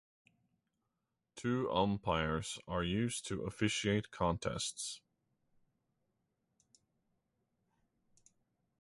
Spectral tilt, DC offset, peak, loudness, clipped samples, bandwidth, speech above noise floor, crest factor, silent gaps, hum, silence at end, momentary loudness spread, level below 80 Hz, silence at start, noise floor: -4.5 dB/octave; under 0.1%; -18 dBFS; -37 LUFS; under 0.1%; 11.5 kHz; 51 dB; 22 dB; none; none; 3.8 s; 9 LU; -58 dBFS; 1.35 s; -87 dBFS